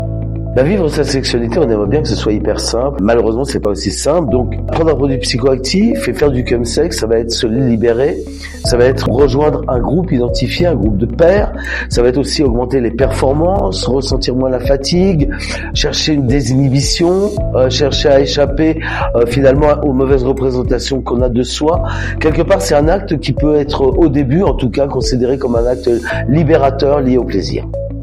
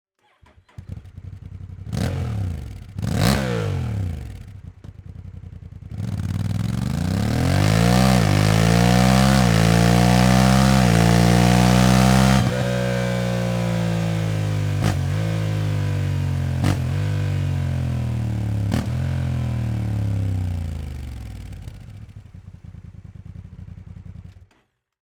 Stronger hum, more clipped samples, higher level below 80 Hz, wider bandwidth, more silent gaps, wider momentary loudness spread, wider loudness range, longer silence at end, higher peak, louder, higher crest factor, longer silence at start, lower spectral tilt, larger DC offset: neither; neither; first, -22 dBFS vs -34 dBFS; second, 13.5 kHz vs over 20 kHz; neither; second, 5 LU vs 24 LU; second, 2 LU vs 14 LU; second, 0 s vs 0.7 s; about the same, 0 dBFS vs 0 dBFS; first, -13 LUFS vs -20 LUFS; second, 12 dB vs 20 dB; second, 0 s vs 0.8 s; about the same, -6 dB/octave vs -6 dB/octave; neither